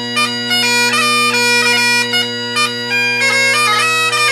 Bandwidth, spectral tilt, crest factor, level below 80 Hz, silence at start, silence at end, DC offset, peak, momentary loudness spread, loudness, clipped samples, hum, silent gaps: 16 kHz; -1 dB/octave; 12 dB; -66 dBFS; 0 s; 0 s; under 0.1%; -2 dBFS; 5 LU; -11 LUFS; under 0.1%; none; none